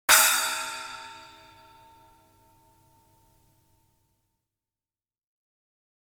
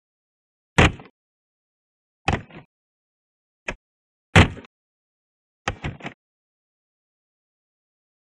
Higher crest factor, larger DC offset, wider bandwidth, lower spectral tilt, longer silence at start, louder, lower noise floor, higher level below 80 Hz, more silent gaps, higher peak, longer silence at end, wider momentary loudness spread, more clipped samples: about the same, 28 dB vs 26 dB; neither; first, 19.5 kHz vs 10.5 kHz; second, 2.5 dB/octave vs -5 dB/octave; second, 0.1 s vs 0.8 s; about the same, -22 LUFS vs -21 LUFS; about the same, under -90 dBFS vs under -90 dBFS; second, -68 dBFS vs -38 dBFS; second, none vs 1.10-2.25 s, 2.65-3.66 s, 3.75-4.33 s, 4.66-5.65 s; about the same, -4 dBFS vs -2 dBFS; first, 4.8 s vs 2.3 s; first, 27 LU vs 22 LU; neither